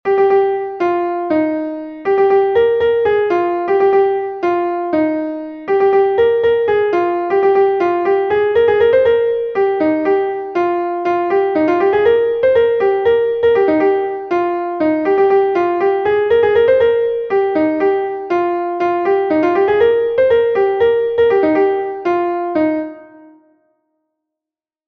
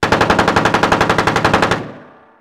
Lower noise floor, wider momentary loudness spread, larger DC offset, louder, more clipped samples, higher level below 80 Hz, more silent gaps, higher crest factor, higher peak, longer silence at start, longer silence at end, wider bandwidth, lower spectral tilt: first, -88 dBFS vs -39 dBFS; about the same, 6 LU vs 6 LU; neither; about the same, -15 LUFS vs -13 LUFS; neither; second, -50 dBFS vs -36 dBFS; neither; about the same, 12 dB vs 14 dB; about the same, -2 dBFS vs 0 dBFS; about the same, 0.05 s vs 0 s; first, 1.8 s vs 0.35 s; second, 5.8 kHz vs 17 kHz; first, -7.5 dB/octave vs -4.5 dB/octave